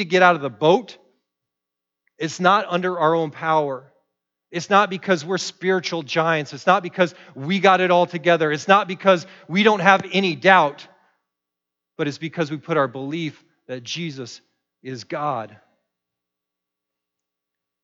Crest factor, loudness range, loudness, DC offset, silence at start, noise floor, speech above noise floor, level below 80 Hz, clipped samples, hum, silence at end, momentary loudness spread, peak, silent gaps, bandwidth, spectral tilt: 20 dB; 14 LU; -20 LUFS; under 0.1%; 0 s; -84 dBFS; 65 dB; -76 dBFS; under 0.1%; none; 2.4 s; 15 LU; -2 dBFS; none; 8 kHz; -5 dB/octave